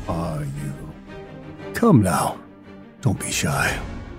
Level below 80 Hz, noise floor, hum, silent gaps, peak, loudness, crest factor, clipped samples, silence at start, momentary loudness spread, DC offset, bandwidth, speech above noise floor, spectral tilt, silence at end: -42 dBFS; -43 dBFS; none; none; -4 dBFS; -22 LUFS; 20 dB; under 0.1%; 0 s; 22 LU; under 0.1%; 16 kHz; 22 dB; -5.5 dB/octave; 0 s